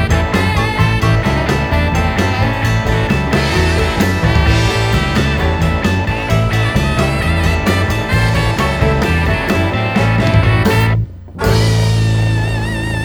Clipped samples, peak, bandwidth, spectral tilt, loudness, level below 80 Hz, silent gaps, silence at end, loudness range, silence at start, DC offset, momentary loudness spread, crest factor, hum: under 0.1%; 0 dBFS; 17.5 kHz; -6 dB/octave; -14 LUFS; -22 dBFS; none; 0 s; 1 LU; 0 s; under 0.1%; 3 LU; 12 dB; none